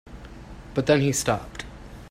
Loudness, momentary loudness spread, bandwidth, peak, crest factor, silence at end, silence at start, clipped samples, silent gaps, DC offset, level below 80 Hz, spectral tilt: -24 LUFS; 23 LU; 16 kHz; -6 dBFS; 22 dB; 0 s; 0.05 s; under 0.1%; none; under 0.1%; -44 dBFS; -4.5 dB/octave